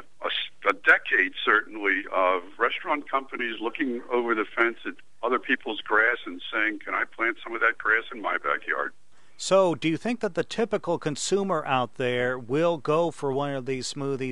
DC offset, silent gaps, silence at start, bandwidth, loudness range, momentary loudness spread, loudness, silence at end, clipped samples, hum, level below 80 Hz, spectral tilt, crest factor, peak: 0.7%; none; 0.2 s; 11.5 kHz; 3 LU; 8 LU; -26 LUFS; 0 s; under 0.1%; none; -66 dBFS; -4 dB/octave; 20 dB; -6 dBFS